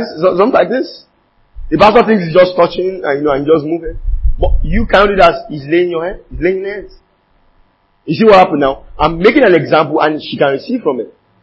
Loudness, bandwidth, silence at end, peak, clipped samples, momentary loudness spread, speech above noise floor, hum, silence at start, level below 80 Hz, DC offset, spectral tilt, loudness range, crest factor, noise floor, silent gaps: -12 LUFS; 8 kHz; 0.3 s; 0 dBFS; 0.4%; 13 LU; 42 dB; none; 0 s; -24 dBFS; under 0.1%; -7.5 dB/octave; 3 LU; 12 dB; -53 dBFS; none